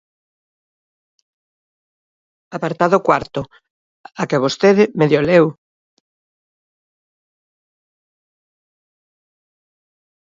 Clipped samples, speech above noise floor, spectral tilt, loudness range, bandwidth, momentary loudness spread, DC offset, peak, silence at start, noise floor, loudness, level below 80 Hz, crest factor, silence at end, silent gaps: under 0.1%; over 75 dB; -6.5 dB/octave; 6 LU; 7.8 kHz; 15 LU; under 0.1%; 0 dBFS; 2.5 s; under -90 dBFS; -16 LUFS; -56 dBFS; 22 dB; 4.7 s; 3.70-4.04 s